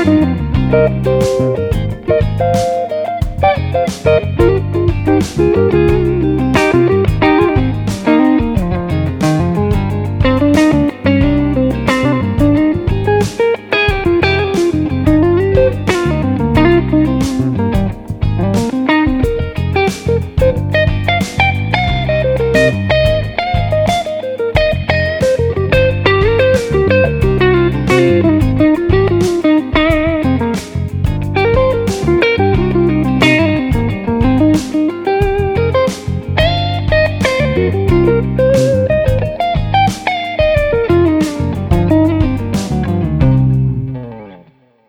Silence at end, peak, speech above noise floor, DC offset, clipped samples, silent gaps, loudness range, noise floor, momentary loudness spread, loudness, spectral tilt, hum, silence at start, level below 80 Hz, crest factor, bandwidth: 0.5 s; 0 dBFS; 35 dB; under 0.1%; under 0.1%; none; 2 LU; -46 dBFS; 6 LU; -13 LUFS; -7 dB/octave; none; 0 s; -24 dBFS; 12 dB; 16.5 kHz